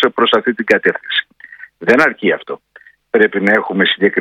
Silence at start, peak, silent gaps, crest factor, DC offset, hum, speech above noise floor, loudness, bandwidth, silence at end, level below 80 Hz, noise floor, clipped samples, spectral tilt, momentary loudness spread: 0 s; 0 dBFS; none; 14 dB; under 0.1%; none; 25 dB; -14 LUFS; 11 kHz; 0 s; -58 dBFS; -38 dBFS; 0.2%; -5.5 dB/octave; 9 LU